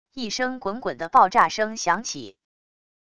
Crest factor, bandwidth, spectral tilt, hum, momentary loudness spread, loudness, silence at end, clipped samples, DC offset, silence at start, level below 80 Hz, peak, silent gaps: 20 dB; 11 kHz; -2.5 dB/octave; none; 12 LU; -22 LUFS; 0.8 s; under 0.1%; 0.4%; 0.15 s; -60 dBFS; -4 dBFS; none